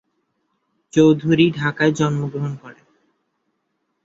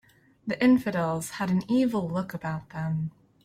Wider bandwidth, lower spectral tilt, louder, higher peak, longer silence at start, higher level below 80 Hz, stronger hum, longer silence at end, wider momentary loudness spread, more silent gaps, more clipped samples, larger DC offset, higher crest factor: second, 7.8 kHz vs 15 kHz; about the same, -6.5 dB/octave vs -6.5 dB/octave; first, -18 LUFS vs -27 LUFS; first, -2 dBFS vs -12 dBFS; first, 0.95 s vs 0.45 s; about the same, -58 dBFS vs -60 dBFS; neither; first, 1.35 s vs 0.35 s; about the same, 12 LU vs 12 LU; neither; neither; neither; about the same, 18 dB vs 16 dB